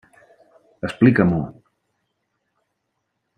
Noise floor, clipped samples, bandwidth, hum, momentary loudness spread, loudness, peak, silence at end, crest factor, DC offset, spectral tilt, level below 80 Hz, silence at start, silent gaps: -75 dBFS; under 0.1%; 9.4 kHz; none; 16 LU; -18 LUFS; -2 dBFS; 1.85 s; 20 dB; under 0.1%; -9 dB/octave; -54 dBFS; 0.85 s; none